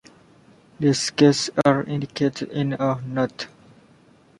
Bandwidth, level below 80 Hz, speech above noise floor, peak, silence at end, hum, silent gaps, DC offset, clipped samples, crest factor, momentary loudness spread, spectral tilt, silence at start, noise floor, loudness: 11.5 kHz; -60 dBFS; 33 dB; -4 dBFS; 0.95 s; none; none; under 0.1%; under 0.1%; 20 dB; 10 LU; -5.5 dB/octave; 0.8 s; -54 dBFS; -22 LUFS